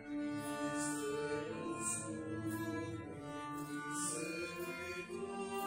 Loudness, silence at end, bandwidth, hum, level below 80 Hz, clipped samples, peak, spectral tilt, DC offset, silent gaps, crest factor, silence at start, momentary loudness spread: -41 LUFS; 0 s; 16 kHz; none; -72 dBFS; under 0.1%; -26 dBFS; -4 dB/octave; under 0.1%; none; 16 dB; 0 s; 6 LU